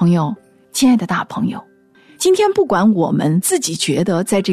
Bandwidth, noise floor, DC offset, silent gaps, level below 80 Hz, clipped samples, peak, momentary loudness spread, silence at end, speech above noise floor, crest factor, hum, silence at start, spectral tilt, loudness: 14 kHz; -48 dBFS; under 0.1%; none; -56 dBFS; under 0.1%; -4 dBFS; 9 LU; 0 s; 33 dB; 12 dB; none; 0 s; -5 dB/octave; -16 LUFS